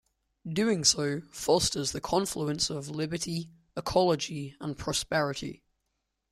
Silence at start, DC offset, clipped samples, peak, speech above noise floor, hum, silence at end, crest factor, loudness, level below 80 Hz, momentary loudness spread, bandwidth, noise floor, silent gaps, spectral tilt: 0.45 s; under 0.1%; under 0.1%; -8 dBFS; 51 dB; none; 0.75 s; 22 dB; -29 LUFS; -56 dBFS; 13 LU; 16 kHz; -81 dBFS; none; -3.5 dB/octave